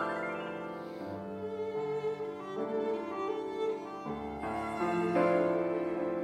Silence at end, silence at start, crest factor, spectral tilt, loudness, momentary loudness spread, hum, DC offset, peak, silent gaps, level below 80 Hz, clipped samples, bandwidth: 0 s; 0 s; 18 dB; -7 dB/octave; -34 LUFS; 11 LU; none; under 0.1%; -16 dBFS; none; -64 dBFS; under 0.1%; 10.5 kHz